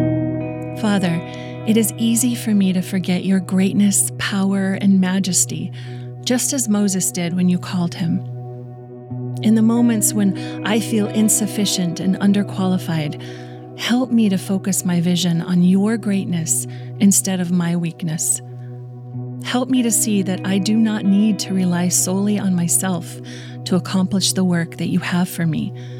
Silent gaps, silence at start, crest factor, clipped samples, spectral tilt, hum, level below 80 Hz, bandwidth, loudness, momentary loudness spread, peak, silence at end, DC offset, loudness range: none; 0 s; 14 dB; under 0.1%; -4.5 dB/octave; none; -60 dBFS; 17 kHz; -18 LUFS; 14 LU; -4 dBFS; 0 s; under 0.1%; 3 LU